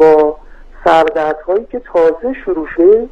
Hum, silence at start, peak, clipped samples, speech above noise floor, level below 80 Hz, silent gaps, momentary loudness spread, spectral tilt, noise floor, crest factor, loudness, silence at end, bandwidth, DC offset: none; 0 s; 0 dBFS; under 0.1%; 21 dB; -38 dBFS; none; 9 LU; -6.5 dB/octave; -34 dBFS; 12 dB; -13 LUFS; 0.05 s; 7.8 kHz; under 0.1%